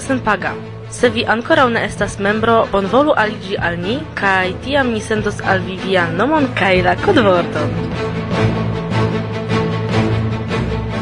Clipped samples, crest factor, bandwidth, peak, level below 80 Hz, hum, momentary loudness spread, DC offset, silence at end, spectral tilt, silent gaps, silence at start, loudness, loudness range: under 0.1%; 16 dB; 11 kHz; 0 dBFS; -36 dBFS; none; 7 LU; 0.3%; 0 s; -6 dB/octave; none; 0 s; -16 LUFS; 2 LU